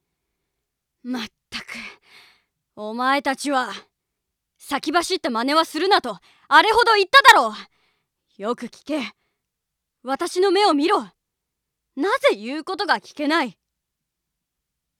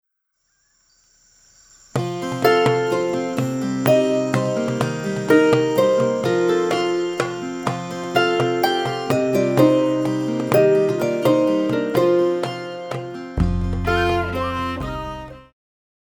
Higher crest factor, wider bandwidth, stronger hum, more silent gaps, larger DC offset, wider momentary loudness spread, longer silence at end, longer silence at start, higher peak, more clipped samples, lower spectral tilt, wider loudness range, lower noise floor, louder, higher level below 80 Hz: about the same, 22 dB vs 18 dB; about the same, 19.5 kHz vs over 20 kHz; neither; neither; neither; first, 20 LU vs 11 LU; first, 1.5 s vs 0.65 s; second, 1.05 s vs 1.95 s; about the same, -2 dBFS vs 0 dBFS; neither; second, -2 dB/octave vs -6 dB/octave; first, 10 LU vs 5 LU; first, -81 dBFS vs -71 dBFS; about the same, -19 LUFS vs -20 LUFS; second, -62 dBFS vs -38 dBFS